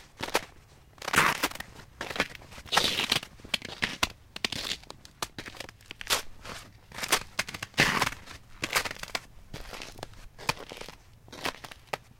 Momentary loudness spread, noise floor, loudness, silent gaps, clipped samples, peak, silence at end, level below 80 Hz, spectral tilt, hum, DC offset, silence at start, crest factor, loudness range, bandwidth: 20 LU; -55 dBFS; -30 LUFS; none; under 0.1%; -6 dBFS; 0.15 s; -52 dBFS; -1.5 dB/octave; none; under 0.1%; 0 s; 28 dB; 6 LU; 17 kHz